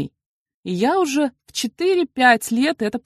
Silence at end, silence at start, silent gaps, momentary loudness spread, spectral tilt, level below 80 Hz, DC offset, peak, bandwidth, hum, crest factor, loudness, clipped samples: 0.05 s; 0 s; 0.26-0.46 s, 0.54-0.63 s; 12 LU; -4 dB/octave; -62 dBFS; under 0.1%; -4 dBFS; 13 kHz; none; 18 dB; -19 LUFS; under 0.1%